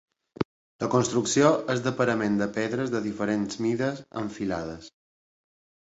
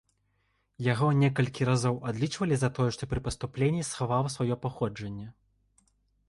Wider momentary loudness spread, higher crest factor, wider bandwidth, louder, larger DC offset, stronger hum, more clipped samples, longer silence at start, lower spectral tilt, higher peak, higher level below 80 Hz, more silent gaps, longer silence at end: first, 12 LU vs 9 LU; about the same, 22 dB vs 18 dB; second, 8.2 kHz vs 11.5 kHz; about the same, -27 LUFS vs -29 LUFS; neither; second, none vs 50 Hz at -55 dBFS; neither; second, 0.4 s vs 0.8 s; about the same, -5 dB/octave vs -6 dB/octave; first, -6 dBFS vs -12 dBFS; second, -60 dBFS vs -52 dBFS; first, 0.45-0.79 s vs none; about the same, 0.95 s vs 0.95 s